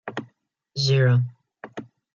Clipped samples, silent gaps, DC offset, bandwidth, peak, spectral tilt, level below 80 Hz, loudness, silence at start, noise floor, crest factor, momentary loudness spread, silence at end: under 0.1%; none; under 0.1%; 7.2 kHz; -10 dBFS; -6 dB/octave; -64 dBFS; -21 LUFS; 0.05 s; -62 dBFS; 16 dB; 21 LU; 0.35 s